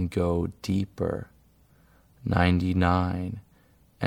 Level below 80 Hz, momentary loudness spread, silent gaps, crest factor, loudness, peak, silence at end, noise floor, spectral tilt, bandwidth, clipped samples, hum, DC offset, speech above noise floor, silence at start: -44 dBFS; 14 LU; none; 22 dB; -27 LUFS; -6 dBFS; 0 s; -60 dBFS; -7.5 dB/octave; 12.5 kHz; under 0.1%; none; under 0.1%; 35 dB; 0 s